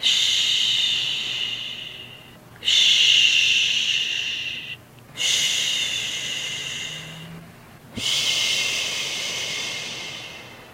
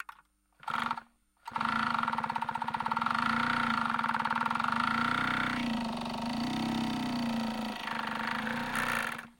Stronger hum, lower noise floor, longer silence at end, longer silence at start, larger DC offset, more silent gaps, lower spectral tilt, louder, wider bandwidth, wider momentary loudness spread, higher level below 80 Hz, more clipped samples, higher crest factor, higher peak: neither; second, -45 dBFS vs -64 dBFS; about the same, 0 s vs 0.1 s; about the same, 0 s vs 0 s; neither; neither; second, 1 dB/octave vs -4 dB/octave; first, -20 LUFS vs -32 LUFS; about the same, 16 kHz vs 17 kHz; first, 21 LU vs 6 LU; about the same, -60 dBFS vs -58 dBFS; neither; about the same, 20 dB vs 18 dB; first, -4 dBFS vs -14 dBFS